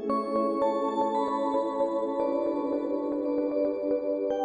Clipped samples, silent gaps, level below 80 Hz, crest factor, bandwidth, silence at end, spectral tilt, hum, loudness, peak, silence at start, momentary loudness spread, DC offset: under 0.1%; none; -66 dBFS; 12 dB; 9 kHz; 0 s; -7 dB/octave; none; -28 LUFS; -16 dBFS; 0 s; 2 LU; under 0.1%